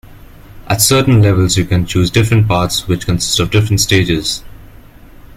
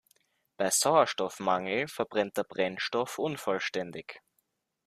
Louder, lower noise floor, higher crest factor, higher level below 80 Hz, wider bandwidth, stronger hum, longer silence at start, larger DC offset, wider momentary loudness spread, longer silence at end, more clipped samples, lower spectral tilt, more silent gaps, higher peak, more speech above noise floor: first, -12 LUFS vs -29 LUFS; second, -37 dBFS vs -78 dBFS; second, 14 dB vs 22 dB; first, -32 dBFS vs -76 dBFS; about the same, 16 kHz vs 15.5 kHz; neither; second, 0.05 s vs 0.6 s; neither; second, 7 LU vs 10 LU; second, 0.1 s vs 0.7 s; neither; first, -4.5 dB/octave vs -2.5 dB/octave; neither; first, 0 dBFS vs -10 dBFS; second, 25 dB vs 48 dB